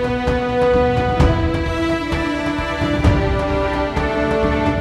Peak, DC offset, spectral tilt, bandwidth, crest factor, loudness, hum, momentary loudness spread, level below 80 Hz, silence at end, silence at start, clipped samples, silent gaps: -2 dBFS; under 0.1%; -7 dB/octave; 12 kHz; 16 dB; -18 LUFS; none; 4 LU; -26 dBFS; 0 s; 0 s; under 0.1%; none